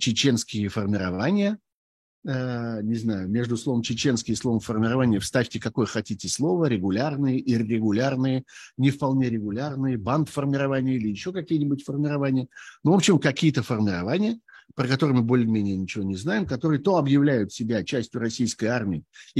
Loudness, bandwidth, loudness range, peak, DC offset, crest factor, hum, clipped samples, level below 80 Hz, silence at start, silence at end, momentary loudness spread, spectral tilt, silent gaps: -25 LUFS; 12.5 kHz; 3 LU; -6 dBFS; under 0.1%; 18 dB; none; under 0.1%; -58 dBFS; 0 s; 0 s; 8 LU; -5.5 dB/octave; 1.74-2.22 s